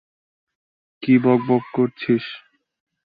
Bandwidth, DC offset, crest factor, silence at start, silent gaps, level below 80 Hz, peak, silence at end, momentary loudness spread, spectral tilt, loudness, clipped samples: 5 kHz; under 0.1%; 18 dB; 1 s; none; -64 dBFS; -4 dBFS; 0.7 s; 15 LU; -10.5 dB/octave; -19 LUFS; under 0.1%